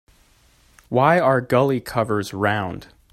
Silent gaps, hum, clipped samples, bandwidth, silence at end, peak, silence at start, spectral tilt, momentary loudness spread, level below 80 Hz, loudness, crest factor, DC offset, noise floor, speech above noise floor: none; none; under 0.1%; 15.5 kHz; 0.3 s; -2 dBFS; 0.9 s; -6.5 dB/octave; 9 LU; -54 dBFS; -20 LUFS; 20 dB; under 0.1%; -56 dBFS; 37 dB